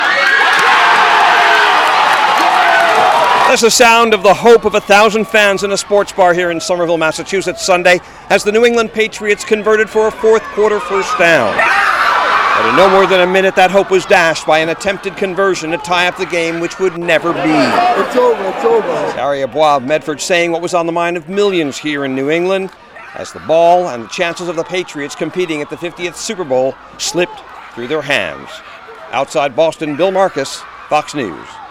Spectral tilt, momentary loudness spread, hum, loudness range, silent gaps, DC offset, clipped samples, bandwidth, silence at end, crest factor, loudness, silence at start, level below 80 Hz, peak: -3 dB/octave; 12 LU; none; 9 LU; none; under 0.1%; under 0.1%; 17.5 kHz; 0 s; 12 dB; -12 LUFS; 0 s; -48 dBFS; 0 dBFS